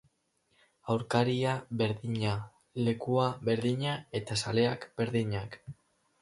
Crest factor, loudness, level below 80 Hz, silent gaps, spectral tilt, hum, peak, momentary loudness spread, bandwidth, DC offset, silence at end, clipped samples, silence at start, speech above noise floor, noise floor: 20 dB; -31 LUFS; -62 dBFS; none; -6 dB/octave; none; -12 dBFS; 10 LU; 11.5 kHz; under 0.1%; 0.5 s; under 0.1%; 0.85 s; 43 dB; -74 dBFS